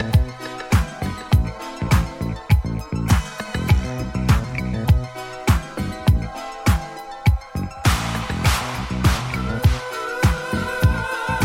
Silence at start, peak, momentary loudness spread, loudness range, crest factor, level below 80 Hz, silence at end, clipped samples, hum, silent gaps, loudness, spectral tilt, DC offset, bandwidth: 0 s; -2 dBFS; 8 LU; 1 LU; 18 dB; -26 dBFS; 0 s; under 0.1%; none; none; -22 LUFS; -5.5 dB/octave; under 0.1%; 16.5 kHz